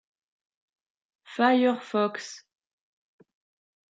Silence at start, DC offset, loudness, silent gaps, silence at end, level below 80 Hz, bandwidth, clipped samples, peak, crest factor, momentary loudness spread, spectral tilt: 1.3 s; under 0.1%; -25 LUFS; none; 1.6 s; -88 dBFS; 7.8 kHz; under 0.1%; -8 dBFS; 22 dB; 19 LU; -4.5 dB/octave